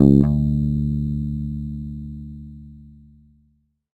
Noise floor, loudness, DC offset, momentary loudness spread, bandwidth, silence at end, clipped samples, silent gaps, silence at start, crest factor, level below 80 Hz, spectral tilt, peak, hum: -64 dBFS; -22 LUFS; under 0.1%; 22 LU; 4.4 kHz; 1.1 s; under 0.1%; none; 0 s; 22 dB; -32 dBFS; -12 dB/octave; 0 dBFS; none